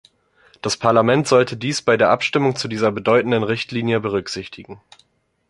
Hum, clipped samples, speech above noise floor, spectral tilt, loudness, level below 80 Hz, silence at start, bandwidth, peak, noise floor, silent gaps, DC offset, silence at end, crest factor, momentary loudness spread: none; under 0.1%; 37 dB; -5 dB/octave; -18 LUFS; -56 dBFS; 0.65 s; 11.5 kHz; -2 dBFS; -55 dBFS; none; under 0.1%; 0.75 s; 18 dB; 13 LU